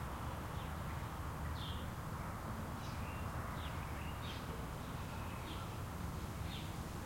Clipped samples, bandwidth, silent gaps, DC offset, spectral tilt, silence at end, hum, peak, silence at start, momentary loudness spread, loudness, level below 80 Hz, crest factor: under 0.1%; 16.5 kHz; none; under 0.1%; -5.5 dB/octave; 0 s; none; -32 dBFS; 0 s; 2 LU; -45 LUFS; -52 dBFS; 12 dB